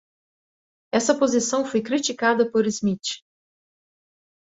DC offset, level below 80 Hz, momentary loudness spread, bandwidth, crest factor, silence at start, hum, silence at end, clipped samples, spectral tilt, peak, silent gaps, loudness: under 0.1%; -66 dBFS; 7 LU; 8 kHz; 18 dB; 0.95 s; none; 1.3 s; under 0.1%; -3.5 dB/octave; -6 dBFS; none; -22 LUFS